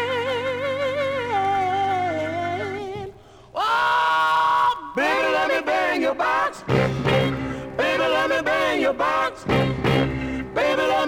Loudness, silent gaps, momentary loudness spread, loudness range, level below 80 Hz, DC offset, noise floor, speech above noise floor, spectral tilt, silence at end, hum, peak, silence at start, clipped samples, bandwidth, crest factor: -22 LUFS; none; 8 LU; 4 LU; -46 dBFS; under 0.1%; -42 dBFS; 20 dB; -5.5 dB/octave; 0 s; none; -6 dBFS; 0 s; under 0.1%; 17 kHz; 16 dB